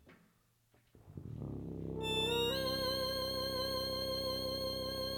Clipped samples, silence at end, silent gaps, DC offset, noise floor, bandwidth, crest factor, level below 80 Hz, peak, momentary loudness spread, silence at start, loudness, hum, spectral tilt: under 0.1%; 0 s; none; under 0.1%; -73 dBFS; 19 kHz; 16 dB; -56 dBFS; -24 dBFS; 12 LU; 0.05 s; -37 LUFS; none; -4 dB/octave